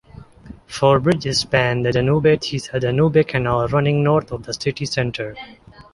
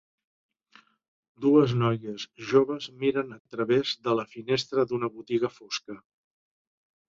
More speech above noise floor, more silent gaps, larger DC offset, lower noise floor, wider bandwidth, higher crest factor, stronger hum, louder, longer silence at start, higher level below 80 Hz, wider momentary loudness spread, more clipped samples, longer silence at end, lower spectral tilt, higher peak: second, 23 dB vs 33 dB; second, none vs 3.40-3.45 s; neither; second, -41 dBFS vs -60 dBFS; first, 11.5 kHz vs 7.6 kHz; about the same, 16 dB vs 20 dB; neither; first, -18 LUFS vs -27 LUFS; second, 0.2 s vs 1.4 s; first, -44 dBFS vs -68 dBFS; about the same, 12 LU vs 13 LU; neither; second, 0.1 s vs 1.15 s; about the same, -6 dB/octave vs -6 dB/octave; first, -2 dBFS vs -8 dBFS